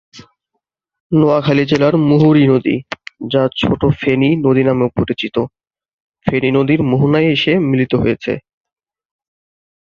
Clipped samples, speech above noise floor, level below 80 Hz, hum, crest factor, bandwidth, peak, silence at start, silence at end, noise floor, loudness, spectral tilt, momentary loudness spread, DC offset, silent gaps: under 0.1%; 61 dB; -44 dBFS; none; 14 dB; 7 kHz; 0 dBFS; 0.15 s; 1.5 s; -74 dBFS; -14 LUFS; -8 dB/octave; 10 LU; under 0.1%; 1.00-1.10 s, 5.93-6.10 s